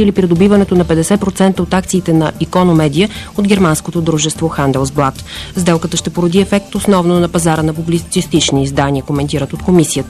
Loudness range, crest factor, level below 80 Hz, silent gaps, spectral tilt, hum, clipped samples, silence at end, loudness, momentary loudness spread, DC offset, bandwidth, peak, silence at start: 2 LU; 12 dB; -32 dBFS; none; -5.5 dB/octave; none; under 0.1%; 0 s; -13 LUFS; 6 LU; 0.2%; 14 kHz; 0 dBFS; 0 s